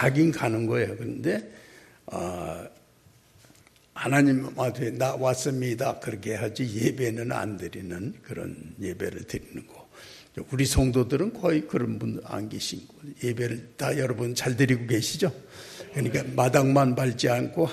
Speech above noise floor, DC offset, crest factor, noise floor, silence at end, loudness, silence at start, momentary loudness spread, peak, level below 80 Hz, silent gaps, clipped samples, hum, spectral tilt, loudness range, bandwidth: 32 dB; under 0.1%; 20 dB; -58 dBFS; 0 s; -27 LUFS; 0 s; 17 LU; -6 dBFS; -48 dBFS; none; under 0.1%; none; -5.5 dB/octave; 7 LU; 13.5 kHz